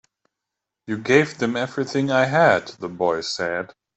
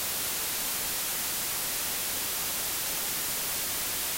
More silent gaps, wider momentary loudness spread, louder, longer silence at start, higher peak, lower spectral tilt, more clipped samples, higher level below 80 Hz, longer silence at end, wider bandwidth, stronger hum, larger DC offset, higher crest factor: neither; first, 12 LU vs 0 LU; first, -21 LUFS vs -28 LUFS; first, 0.9 s vs 0 s; first, -2 dBFS vs -20 dBFS; first, -5 dB/octave vs 0 dB/octave; neither; second, -64 dBFS vs -56 dBFS; first, 0.3 s vs 0 s; second, 8.2 kHz vs 16 kHz; neither; neither; first, 20 dB vs 12 dB